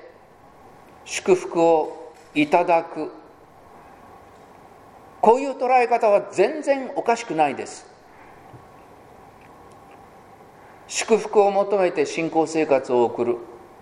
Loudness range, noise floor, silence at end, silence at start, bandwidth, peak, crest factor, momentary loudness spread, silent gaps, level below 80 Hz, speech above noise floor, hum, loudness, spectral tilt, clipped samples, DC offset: 8 LU; -49 dBFS; 0.25 s; 1.05 s; 12.5 kHz; 0 dBFS; 22 dB; 13 LU; none; -64 dBFS; 29 dB; none; -21 LUFS; -4.5 dB/octave; under 0.1%; under 0.1%